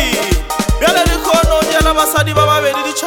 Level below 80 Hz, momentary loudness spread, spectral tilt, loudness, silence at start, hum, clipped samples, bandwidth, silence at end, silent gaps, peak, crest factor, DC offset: -20 dBFS; 4 LU; -3.5 dB/octave; -12 LUFS; 0 s; none; under 0.1%; 18 kHz; 0 s; none; 0 dBFS; 12 dB; under 0.1%